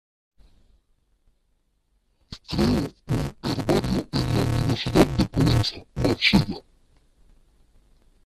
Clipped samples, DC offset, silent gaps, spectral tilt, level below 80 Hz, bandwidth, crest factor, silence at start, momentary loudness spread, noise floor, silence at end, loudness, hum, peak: under 0.1%; under 0.1%; none; -6 dB/octave; -38 dBFS; 14.5 kHz; 22 dB; 2.3 s; 10 LU; -68 dBFS; 1.65 s; -23 LUFS; none; -2 dBFS